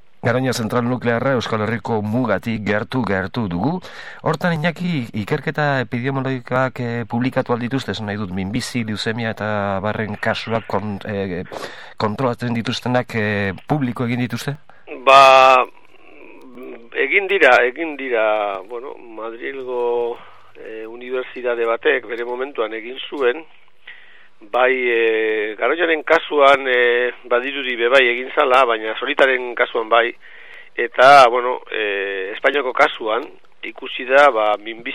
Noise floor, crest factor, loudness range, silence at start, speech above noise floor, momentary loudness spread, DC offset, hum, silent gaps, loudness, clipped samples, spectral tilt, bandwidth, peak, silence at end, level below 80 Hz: -47 dBFS; 18 dB; 8 LU; 0.25 s; 29 dB; 15 LU; 0.9%; none; none; -18 LUFS; under 0.1%; -5.5 dB/octave; 14 kHz; 0 dBFS; 0 s; -58 dBFS